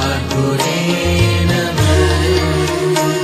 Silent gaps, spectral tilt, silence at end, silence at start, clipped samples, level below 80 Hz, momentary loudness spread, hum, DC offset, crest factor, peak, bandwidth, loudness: none; -5 dB/octave; 0 s; 0 s; under 0.1%; -30 dBFS; 3 LU; none; under 0.1%; 14 dB; 0 dBFS; 15.5 kHz; -14 LUFS